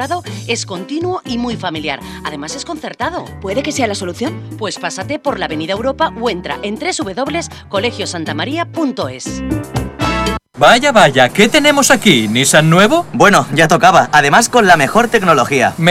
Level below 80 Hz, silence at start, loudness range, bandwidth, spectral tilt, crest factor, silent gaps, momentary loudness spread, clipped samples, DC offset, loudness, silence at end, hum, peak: -38 dBFS; 0 s; 11 LU; 17 kHz; -4 dB/octave; 14 dB; none; 13 LU; 0.7%; under 0.1%; -13 LUFS; 0 s; none; 0 dBFS